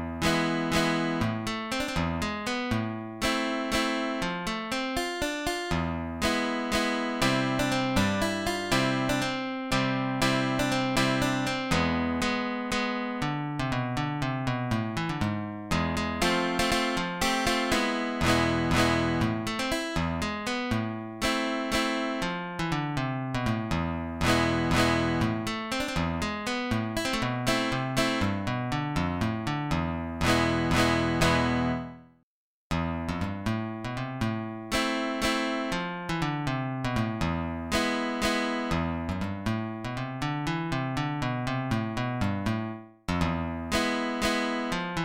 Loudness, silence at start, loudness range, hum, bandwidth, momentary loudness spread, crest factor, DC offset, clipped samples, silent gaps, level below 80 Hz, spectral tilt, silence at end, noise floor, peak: -28 LUFS; 0 s; 4 LU; none; 17 kHz; 7 LU; 18 dB; 0.1%; under 0.1%; 32.23-32.70 s; -44 dBFS; -5 dB/octave; 0 s; -52 dBFS; -10 dBFS